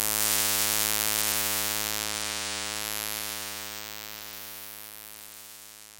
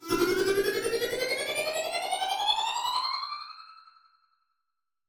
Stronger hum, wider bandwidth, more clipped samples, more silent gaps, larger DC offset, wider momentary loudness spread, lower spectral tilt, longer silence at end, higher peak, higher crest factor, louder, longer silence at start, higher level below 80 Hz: neither; second, 17 kHz vs over 20 kHz; neither; neither; neither; first, 19 LU vs 9 LU; second, 0 dB/octave vs -2 dB/octave; second, 0 s vs 1.25 s; first, -2 dBFS vs -14 dBFS; first, 28 dB vs 18 dB; about the same, -27 LUFS vs -28 LUFS; about the same, 0 s vs 0 s; about the same, -54 dBFS vs -58 dBFS